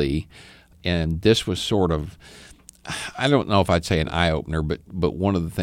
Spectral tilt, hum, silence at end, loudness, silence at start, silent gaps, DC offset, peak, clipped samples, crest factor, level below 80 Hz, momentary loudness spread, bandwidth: -5.5 dB/octave; none; 0 s; -23 LUFS; 0 s; none; under 0.1%; -4 dBFS; under 0.1%; 20 dB; -38 dBFS; 11 LU; 16 kHz